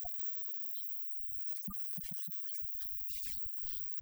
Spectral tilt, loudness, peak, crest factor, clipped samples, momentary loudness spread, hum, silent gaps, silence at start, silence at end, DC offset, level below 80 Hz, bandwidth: -3 dB/octave; -37 LUFS; -22 dBFS; 18 dB; under 0.1%; 1 LU; none; none; 0 s; 0 s; under 0.1%; -64 dBFS; over 20 kHz